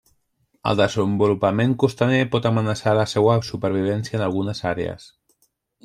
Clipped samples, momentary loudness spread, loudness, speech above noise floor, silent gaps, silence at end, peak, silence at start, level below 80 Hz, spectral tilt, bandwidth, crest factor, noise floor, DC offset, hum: under 0.1%; 7 LU; -21 LUFS; 47 dB; none; 0.8 s; -4 dBFS; 0.65 s; -54 dBFS; -6.5 dB/octave; 12 kHz; 18 dB; -67 dBFS; under 0.1%; none